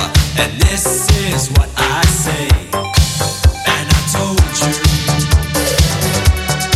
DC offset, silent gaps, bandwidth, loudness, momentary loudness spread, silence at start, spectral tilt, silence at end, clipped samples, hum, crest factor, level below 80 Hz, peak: under 0.1%; none; 15.5 kHz; -14 LUFS; 3 LU; 0 s; -4 dB/octave; 0 s; under 0.1%; none; 14 dB; -18 dBFS; 0 dBFS